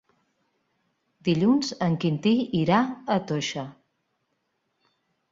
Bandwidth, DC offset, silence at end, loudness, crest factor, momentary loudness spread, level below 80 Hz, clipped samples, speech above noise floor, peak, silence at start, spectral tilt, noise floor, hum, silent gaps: 7.8 kHz; under 0.1%; 1.6 s; -24 LUFS; 20 dB; 9 LU; -66 dBFS; under 0.1%; 52 dB; -8 dBFS; 1.25 s; -6 dB/octave; -76 dBFS; none; none